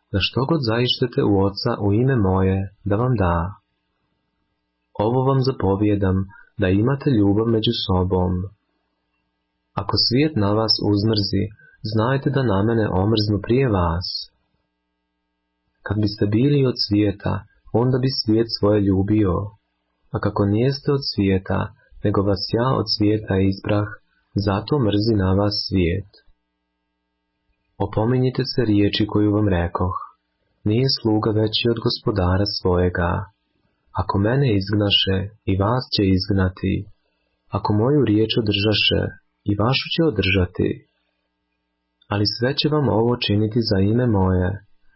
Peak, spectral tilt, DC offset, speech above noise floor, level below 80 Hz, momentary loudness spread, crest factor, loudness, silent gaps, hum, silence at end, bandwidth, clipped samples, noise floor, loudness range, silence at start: -6 dBFS; -10 dB/octave; under 0.1%; 55 dB; -36 dBFS; 9 LU; 14 dB; -20 LUFS; none; none; 0.4 s; 5.8 kHz; under 0.1%; -75 dBFS; 3 LU; 0.1 s